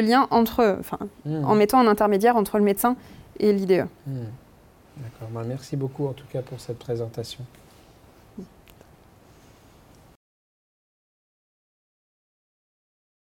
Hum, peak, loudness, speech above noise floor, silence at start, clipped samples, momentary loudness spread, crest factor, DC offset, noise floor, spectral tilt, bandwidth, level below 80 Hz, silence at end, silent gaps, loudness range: none; -8 dBFS; -23 LUFS; 30 dB; 0 s; under 0.1%; 21 LU; 18 dB; under 0.1%; -53 dBFS; -6 dB/octave; 17 kHz; -56 dBFS; 4.8 s; none; 16 LU